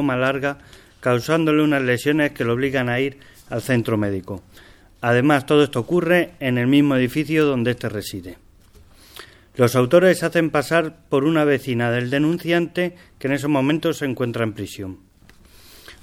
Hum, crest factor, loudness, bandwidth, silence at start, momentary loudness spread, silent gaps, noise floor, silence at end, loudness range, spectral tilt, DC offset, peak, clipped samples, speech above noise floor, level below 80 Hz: none; 18 dB; -20 LUFS; 17 kHz; 0 s; 13 LU; none; -49 dBFS; 0.1 s; 4 LU; -6 dB/octave; under 0.1%; -2 dBFS; under 0.1%; 30 dB; -54 dBFS